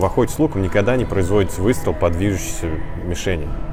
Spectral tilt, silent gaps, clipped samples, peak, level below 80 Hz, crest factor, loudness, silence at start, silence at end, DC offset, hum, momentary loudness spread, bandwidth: -6 dB/octave; none; under 0.1%; -4 dBFS; -30 dBFS; 14 dB; -20 LUFS; 0 s; 0 s; under 0.1%; none; 8 LU; 16.5 kHz